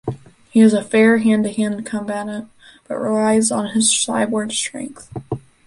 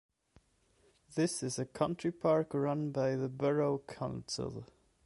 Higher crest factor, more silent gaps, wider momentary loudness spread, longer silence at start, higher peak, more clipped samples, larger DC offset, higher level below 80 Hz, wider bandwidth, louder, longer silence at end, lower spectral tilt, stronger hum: about the same, 16 dB vs 20 dB; neither; first, 17 LU vs 10 LU; second, 0.05 s vs 1.1 s; first, -2 dBFS vs -16 dBFS; neither; neither; first, -56 dBFS vs -66 dBFS; about the same, 11.5 kHz vs 11.5 kHz; first, -17 LUFS vs -35 LUFS; second, 0.25 s vs 0.4 s; second, -4 dB/octave vs -5.5 dB/octave; neither